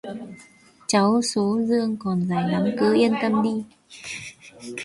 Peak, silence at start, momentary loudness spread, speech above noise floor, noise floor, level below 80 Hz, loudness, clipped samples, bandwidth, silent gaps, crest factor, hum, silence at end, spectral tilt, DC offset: -6 dBFS; 0.05 s; 20 LU; 30 dB; -52 dBFS; -62 dBFS; -22 LUFS; under 0.1%; 11.5 kHz; none; 18 dB; none; 0 s; -5.5 dB/octave; under 0.1%